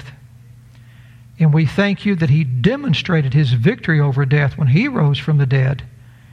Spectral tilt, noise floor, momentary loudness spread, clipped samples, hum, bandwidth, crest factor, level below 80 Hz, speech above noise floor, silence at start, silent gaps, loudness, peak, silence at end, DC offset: -8 dB/octave; -42 dBFS; 3 LU; under 0.1%; none; 6.6 kHz; 14 dB; -46 dBFS; 27 dB; 0 s; none; -16 LUFS; -2 dBFS; 0.45 s; under 0.1%